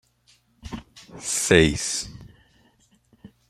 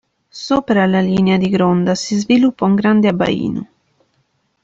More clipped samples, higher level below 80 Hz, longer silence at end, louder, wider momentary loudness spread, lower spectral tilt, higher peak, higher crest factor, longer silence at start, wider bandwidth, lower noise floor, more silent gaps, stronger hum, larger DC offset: neither; first, -44 dBFS vs -50 dBFS; second, 0.25 s vs 1 s; second, -21 LUFS vs -15 LUFS; first, 22 LU vs 7 LU; second, -3.5 dB/octave vs -6.5 dB/octave; about the same, -2 dBFS vs -2 dBFS; first, 26 dB vs 12 dB; first, 0.65 s vs 0.35 s; first, 15 kHz vs 7.8 kHz; about the same, -62 dBFS vs -64 dBFS; neither; neither; neither